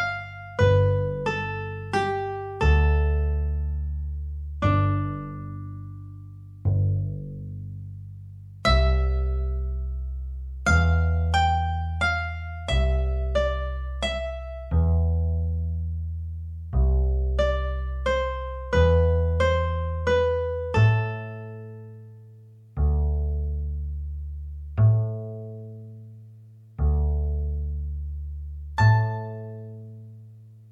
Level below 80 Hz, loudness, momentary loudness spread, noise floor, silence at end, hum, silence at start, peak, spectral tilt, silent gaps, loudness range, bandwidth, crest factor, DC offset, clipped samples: -28 dBFS; -25 LUFS; 18 LU; -48 dBFS; 0.05 s; 50 Hz at -60 dBFS; 0 s; -6 dBFS; -7 dB/octave; none; 6 LU; 9 kHz; 18 dB; under 0.1%; under 0.1%